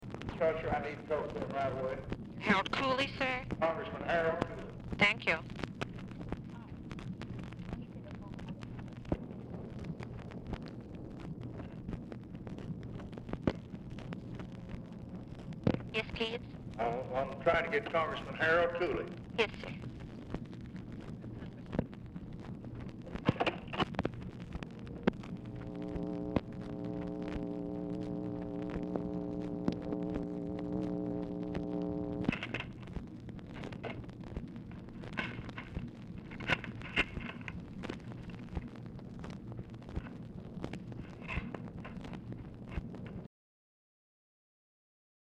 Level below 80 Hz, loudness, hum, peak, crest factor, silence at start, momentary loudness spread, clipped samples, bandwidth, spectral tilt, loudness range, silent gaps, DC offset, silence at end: -54 dBFS; -38 LUFS; none; -14 dBFS; 26 dB; 0 s; 14 LU; under 0.1%; 11 kHz; -6.5 dB/octave; 11 LU; none; under 0.1%; 1.95 s